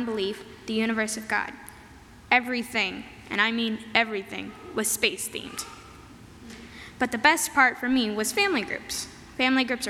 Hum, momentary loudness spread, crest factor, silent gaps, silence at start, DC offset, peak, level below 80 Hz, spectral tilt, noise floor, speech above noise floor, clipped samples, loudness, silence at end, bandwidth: none; 19 LU; 22 dB; none; 0 s; under 0.1%; -4 dBFS; -56 dBFS; -2 dB/octave; -49 dBFS; 22 dB; under 0.1%; -25 LUFS; 0 s; 17.5 kHz